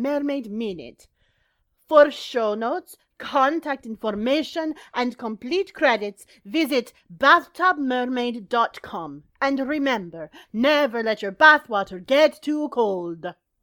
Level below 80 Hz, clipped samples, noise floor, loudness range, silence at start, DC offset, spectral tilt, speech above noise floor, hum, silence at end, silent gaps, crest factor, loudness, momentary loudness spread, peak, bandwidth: -64 dBFS; under 0.1%; -69 dBFS; 5 LU; 0 s; under 0.1%; -4.5 dB/octave; 46 dB; none; 0.3 s; none; 22 dB; -22 LUFS; 16 LU; -2 dBFS; 18.5 kHz